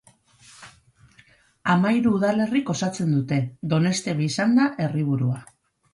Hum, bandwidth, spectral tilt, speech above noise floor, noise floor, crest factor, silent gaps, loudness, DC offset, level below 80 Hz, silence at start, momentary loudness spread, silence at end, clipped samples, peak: none; 11.5 kHz; -6 dB/octave; 35 dB; -57 dBFS; 18 dB; none; -23 LUFS; under 0.1%; -62 dBFS; 0.6 s; 6 LU; 0.5 s; under 0.1%; -6 dBFS